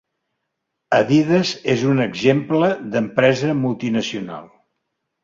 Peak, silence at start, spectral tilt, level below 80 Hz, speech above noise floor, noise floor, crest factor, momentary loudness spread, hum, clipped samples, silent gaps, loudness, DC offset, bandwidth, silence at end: -2 dBFS; 0.9 s; -6 dB/octave; -58 dBFS; 59 dB; -77 dBFS; 18 dB; 8 LU; none; under 0.1%; none; -18 LUFS; under 0.1%; 7.8 kHz; 0.8 s